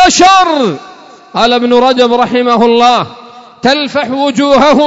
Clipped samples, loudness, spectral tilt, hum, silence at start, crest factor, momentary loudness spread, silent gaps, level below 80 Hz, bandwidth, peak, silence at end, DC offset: 0.3%; -8 LUFS; -3.5 dB/octave; none; 0 s; 8 dB; 9 LU; none; -40 dBFS; 8 kHz; 0 dBFS; 0 s; under 0.1%